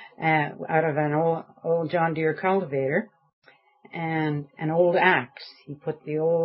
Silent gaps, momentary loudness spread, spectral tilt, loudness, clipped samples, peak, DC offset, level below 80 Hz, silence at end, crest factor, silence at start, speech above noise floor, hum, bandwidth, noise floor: 3.33-3.42 s; 14 LU; -11 dB/octave; -25 LUFS; under 0.1%; -4 dBFS; under 0.1%; -74 dBFS; 0 s; 22 dB; 0 s; 31 dB; none; 5.8 kHz; -55 dBFS